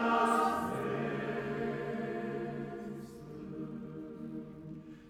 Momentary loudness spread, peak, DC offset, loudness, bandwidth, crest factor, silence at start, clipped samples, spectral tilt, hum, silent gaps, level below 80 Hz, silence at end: 17 LU; -18 dBFS; under 0.1%; -36 LUFS; 17.5 kHz; 20 dB; 0 s; under 0.1%; -6 dB/octave; none; none; -64 dBFS; 0 s